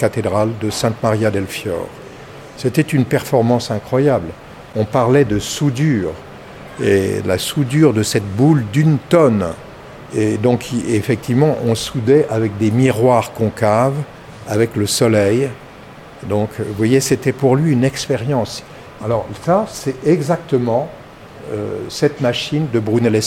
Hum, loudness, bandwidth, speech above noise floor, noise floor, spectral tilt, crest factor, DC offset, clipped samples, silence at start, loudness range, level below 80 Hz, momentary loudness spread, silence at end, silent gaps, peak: none; -16 LUFS; 16.5 kHz; 21 dB; -37 dBFS; -6 dB/octave; 16 dB; under 0.1%; under 0.1%; 0 s; 3 LU; -46 dBFS; 15 LU; 0 s; none; 0 dBFS